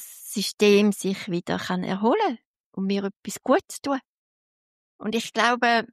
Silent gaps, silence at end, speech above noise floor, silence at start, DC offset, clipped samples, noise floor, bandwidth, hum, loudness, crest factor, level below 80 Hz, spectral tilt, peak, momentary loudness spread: 0.54-0.58 s, 2.45-2.54 s, 2.60-2.72 s, 3.16-3.23 s, 4.07-4.99 s; 0.1 s; over 67 dB; 0 s; under 0.1%; under 0.1%; under -90 dBFS; 15 kHz; none; -24 LUFS; 18 dB; -70 dBFS; -4.5 dB/octave; -6 dBFS; 13 LU